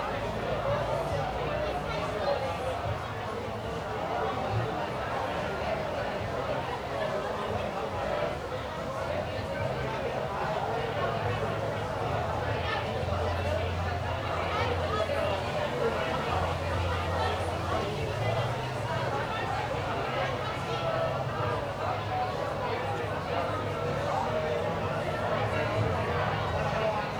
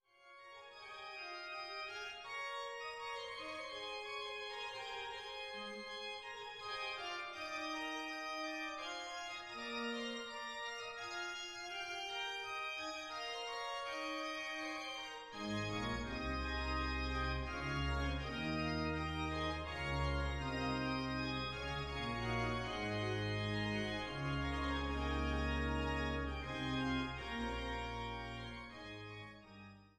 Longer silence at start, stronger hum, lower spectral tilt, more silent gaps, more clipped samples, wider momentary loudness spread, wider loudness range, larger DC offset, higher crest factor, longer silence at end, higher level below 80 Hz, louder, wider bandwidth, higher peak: second, 0 s vs 0.2 s; neither; about the same, -6 dB/octave vs -5 dB/octave; neither; neither; second, 3 LU vs 8 LU; second, 2 LU vs 5 LU; neither; about the same, 14 dB vs 16 dB; about the same, 0 s vs 0.1 s; about the same, -48 dBFS vs -50 dBFS; first, -31 LUFS vs -42 LUFS; first, over 20 kHz vs 13.5 kHz; first, -16 dBFS vs -26 dBFS